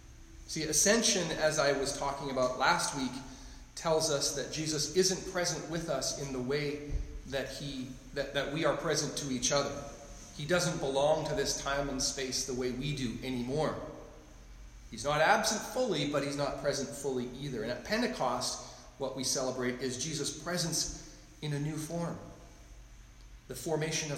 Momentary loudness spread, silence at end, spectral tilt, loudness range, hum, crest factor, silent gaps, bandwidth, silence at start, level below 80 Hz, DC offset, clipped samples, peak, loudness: 14 LU; 0 s; -3 dB/octave; 5 LU; none; 20 dB; none; 16 kHz; 0 s; -52 dBFS; under 0.1%; under 0.1%; -14 dBFS; -32 LUFS